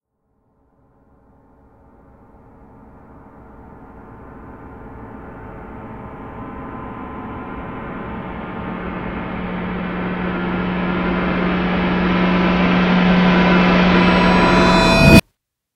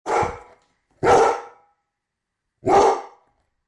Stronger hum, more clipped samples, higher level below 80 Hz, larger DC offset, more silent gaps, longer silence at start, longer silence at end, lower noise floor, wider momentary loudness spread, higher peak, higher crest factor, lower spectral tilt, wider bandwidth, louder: neither; neither; first, -34 dBFS vs -50 dBFS; neither; neither; first, 3.1 s vs 0.05 s; about the same, 0.55 s vs 0.6 s; second, -68 dBFS vs -81 dBFS; first, 23 LU vs 13 LU; first, 0 dBFS vs -4 dBFS; about the same, 18 dB vs 18 dB; first, -6.5 dB/octave vs -4.5 dB/octave; first, 16 kHz vs 11.5 kHz; first, -16 LUFS vs -19 LUFS